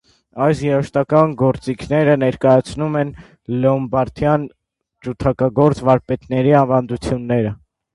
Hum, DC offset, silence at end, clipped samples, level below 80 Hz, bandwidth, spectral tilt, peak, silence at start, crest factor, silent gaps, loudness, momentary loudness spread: none; under 0.1%; 0.4 s; under 0.1%; -42 dBFS; 11.5 kHz; -8 dB/octave; 0 dBFS; 0.35 s; 16 dB; none; -17 LUFS; 11 LU